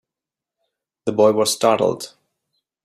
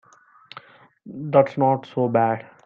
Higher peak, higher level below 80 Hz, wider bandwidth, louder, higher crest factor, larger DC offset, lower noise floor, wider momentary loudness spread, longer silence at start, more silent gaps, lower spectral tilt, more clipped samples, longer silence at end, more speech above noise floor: about the same, -2 dBFS vs -2 dBFS; about the same, -66 dBFS vs -70 dBFS; first, 15.5 kHz vs 7 kHz; first, -18 LUFS vs -21 LUFS; about the same, 18 dB vs 20 dB; neither; first, -87 dBFS vs -50 dBFS; second, 15 LU vs 24 LU; about the same, 1.05 s vs 1.05 s; neither; second, -4 dB/octave vs -9 dB/octave; neither; first, 0.75 s vs 0.25 s; first, 70 dB vs 29 dB